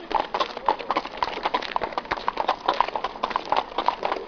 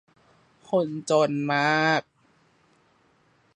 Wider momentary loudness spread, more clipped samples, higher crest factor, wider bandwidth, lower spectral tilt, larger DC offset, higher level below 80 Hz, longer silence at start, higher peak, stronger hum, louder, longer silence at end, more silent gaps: about the same, 4 LU vs 6 LU; neither; about the same, 22 dB vs 20 dB; second, 5.4 kHz vs 11 kHz; second, -3.5 dB/octave vs -5 dB/octave; neither; first, -52 dBFS vs -76 dBFS; second, 0 s vs 0.7 s; first, -4 dBFS vs -8 dBFS; neither; about the same, -26 LUFS vs -24 LUFS; second, 0 s vs 1.55 s; neither